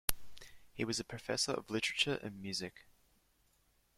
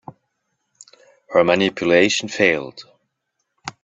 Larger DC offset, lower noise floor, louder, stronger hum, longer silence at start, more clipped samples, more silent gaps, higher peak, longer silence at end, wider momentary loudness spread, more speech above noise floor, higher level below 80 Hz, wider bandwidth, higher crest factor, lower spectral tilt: neither; about the same, -74 dBFS vs -75 dBFS; second, -37 LUFS vs -17 LUFS; neither; second, 0.1 s vs 1.3 s; neither; neither; second, -4 dBFS vs 0 dBFS; first, 1.15 s vs 0.15 s; about the same, 20 LU vs 20 LU; second, 35 dB vs 58 dB; about the same, -58 dBFS vs -60 dBFS; first, 16.5 kHz vs 8.4 kHz; first, 36 dB vs 20 dB; second, -2.5 dB/octave vs -4 dB/octave